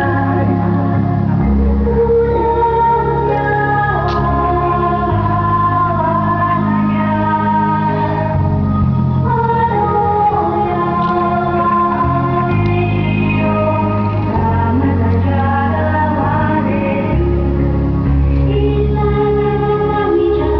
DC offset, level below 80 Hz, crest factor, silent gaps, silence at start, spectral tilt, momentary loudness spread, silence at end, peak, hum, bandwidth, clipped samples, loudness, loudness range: 0.2%; -24 dBFS; 10 dB; none; 0 s; -10.5 dB/octave; 2 LU; 0 s; -4 dBFS; none; 5.4 kHz; under 0.1%; -14 LUFS; 1 LU